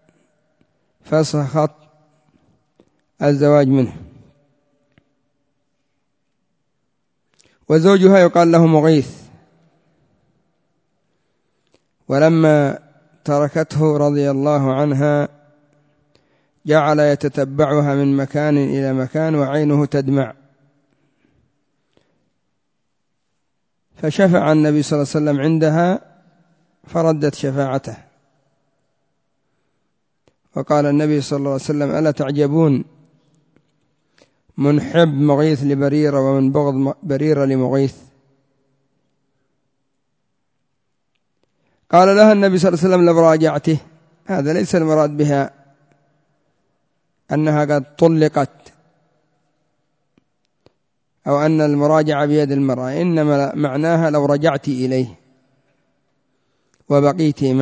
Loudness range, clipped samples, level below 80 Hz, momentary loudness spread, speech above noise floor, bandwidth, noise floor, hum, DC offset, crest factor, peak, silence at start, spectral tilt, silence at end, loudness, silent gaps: 9 LU; under 0.1%; -58 dBFS; 10 LU; 59 dB; 8 kHz; -74 dBFS; none; under 0.1%; 18 dB; 0 dBFS; 1.1 s; -7.5 dB/octave; 0 s; -16 LUFS; none